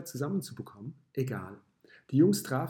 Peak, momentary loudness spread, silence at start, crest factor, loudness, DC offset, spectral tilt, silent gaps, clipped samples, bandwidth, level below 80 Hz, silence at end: -12 dBFS; 19 LU; 0 s; 18 dB; -30 LUFS; under 0.1%; -6.5 dB/octave; none; under 0.1%; 17.5 kHz; -76 dBFS; 0 s